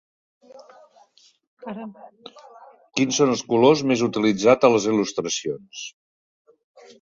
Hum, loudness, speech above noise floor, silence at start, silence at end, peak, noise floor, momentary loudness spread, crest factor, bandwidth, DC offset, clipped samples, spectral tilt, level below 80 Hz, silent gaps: none; -20 LUFS; 36 dB; 1.65 s; 1.15 s; -2 dBFS; -57 dBFS; 19 LU; 20 dB; 7.6 kHz; under 0.1%; under 0.1%; -4.5 dB/octave; -64 dBFS; none